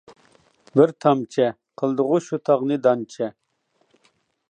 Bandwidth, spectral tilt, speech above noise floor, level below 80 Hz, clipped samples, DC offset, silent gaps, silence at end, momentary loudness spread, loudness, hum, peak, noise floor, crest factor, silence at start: 9.4 kHz; -7 dB/octave; 47 dB; -76 dBFS; under 0.1%; under 0.1%; none; 1.2 s; 10 LU; -21 LUFS; none; -2 dBFS; -67 dBFS; 20 dB; 0.75 s